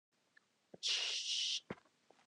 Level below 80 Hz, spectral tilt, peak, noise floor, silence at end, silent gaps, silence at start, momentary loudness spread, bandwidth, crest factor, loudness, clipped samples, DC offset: -86 dBFS; 0.5 dB/octave; -24 dBFS; -74 dBFS; 0.5 s; none; 0.75 s; 15 LU; 12 kHz; 18 dB; -37 LUFS; under 0.1%; under 0.1%